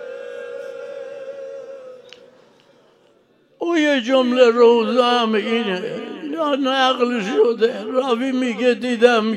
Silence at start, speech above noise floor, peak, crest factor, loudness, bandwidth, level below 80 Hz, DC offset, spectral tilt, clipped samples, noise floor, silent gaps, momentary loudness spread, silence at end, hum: 0 s; 40 dB; 0 dBFS; 18 dB; -18 LUFS; 10.5 kHz; -76 dBFS; under 0.1%; -4.5 dB/octave; under 0.1%; -57 dBFS; none; 19 LU; 0 s; none